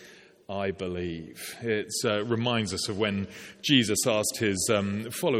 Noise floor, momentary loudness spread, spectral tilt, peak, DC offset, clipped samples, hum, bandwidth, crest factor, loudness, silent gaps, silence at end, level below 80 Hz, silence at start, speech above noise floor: -50 dBFS; 12 LU; -3.5 dB/octave; -6 dBFS; under 0.1%; under 0.1%; none; 17 kHz; 22 dB; -27 LUFS; none; 0 s; -60 dBFS; 0 s; 22 dB